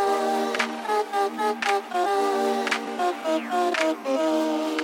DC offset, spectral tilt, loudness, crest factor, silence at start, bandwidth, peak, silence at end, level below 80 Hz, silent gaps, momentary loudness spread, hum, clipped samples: under 0.1%; -2.5 dB/octave; -25 LUFS; 16 dB; 0 s; 17 kHz; -10 dBFS; 0 s; -74 dBFS; none; 3 LU; none; under 0.1%